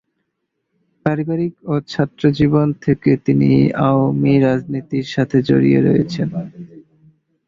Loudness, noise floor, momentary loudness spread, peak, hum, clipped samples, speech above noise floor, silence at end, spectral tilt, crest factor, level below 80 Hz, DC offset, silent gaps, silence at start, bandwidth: -16 LUFS; -74 dBFS; 9 LU; -2 dBFS; none; under 0.1%; 58 dB; 0.7 s; -8.5 dB/octave; 16 dB; -48 dBFS; under 0.1%; none; 1.05 s; 7.2 kHz